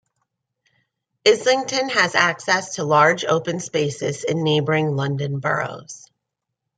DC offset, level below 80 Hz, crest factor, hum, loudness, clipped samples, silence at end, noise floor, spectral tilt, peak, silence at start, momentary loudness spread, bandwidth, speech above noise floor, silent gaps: under 0.1%; -66 dBFS; 20 dB; none; -20 LUFS; under 0.1%; 0.8 s; -81 dBFS; -4 dB/octave; -2 dBFS; 1.25 s; 9 LU; 9.4 kHz; 61 dB; none